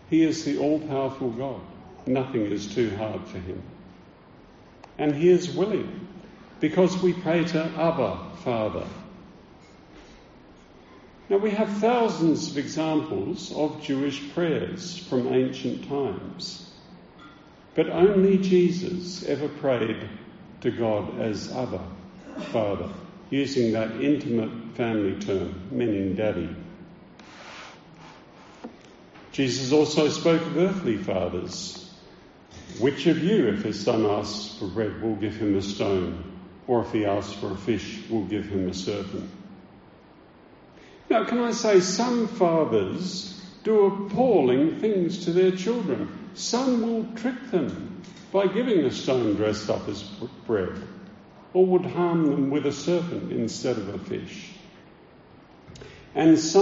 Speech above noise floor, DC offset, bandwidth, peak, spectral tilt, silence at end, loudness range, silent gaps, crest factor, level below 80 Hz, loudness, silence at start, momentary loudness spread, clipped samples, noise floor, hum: 27 dB; under 0.1%; 8 kHz; -6 dBFS; -5.5 dB/octave; 0 s; 7 LU; none; 20 dB; -58 dBFS; -25 LUFS; 0.05 s; 18 LU; under 0.1%; -51 dBFS; none